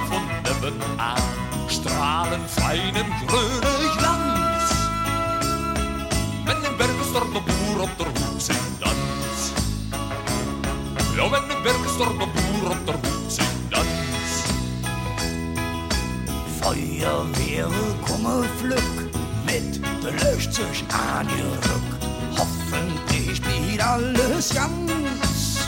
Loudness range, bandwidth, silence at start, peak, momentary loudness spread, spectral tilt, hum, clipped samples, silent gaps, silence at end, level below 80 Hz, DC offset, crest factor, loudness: 3 LU; 17 kHz; 0 s; -6 dBFS; 5 LU; -4 dB/octave; none; under 0.1%; none; 0 s; -34 dBFS; under 0.1%; 18 dB; -23 LUFS